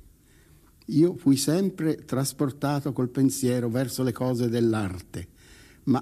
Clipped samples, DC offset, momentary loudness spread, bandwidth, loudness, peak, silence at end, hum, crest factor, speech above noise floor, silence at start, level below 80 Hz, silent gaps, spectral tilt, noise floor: under 0.1%; under 0.1%; 13 LU; 15 kHz; -26 LUFS; -10 dBFS; 0 s; none; 16 dB; 31 dB; 0.9 s; -58 dBFS; none; -6 dB/octave; -56 dBFS